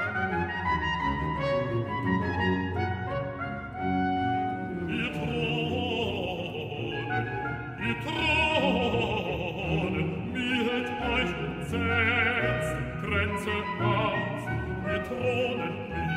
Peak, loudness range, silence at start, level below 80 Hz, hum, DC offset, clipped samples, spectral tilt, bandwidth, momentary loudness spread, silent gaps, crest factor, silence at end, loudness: -12 dBFS; 3 LU; 0 s; -46 dBFS; none; under 0.1%; under 0.1%; -6.5 dB/octave; 15 kHz; 8 LU; none; 16 dB; 0 s; -29 LUFS